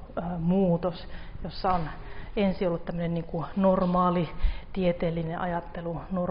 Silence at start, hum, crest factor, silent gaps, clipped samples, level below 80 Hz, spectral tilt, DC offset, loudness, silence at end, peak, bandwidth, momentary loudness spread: 0 s; none; 16 dB; none; under 0.1%; -38 dBFS; -7 dB/octave; under 0.1%; -28 LUFS; 0 s; -12 dBFS; 5.4 kHz; 12 LU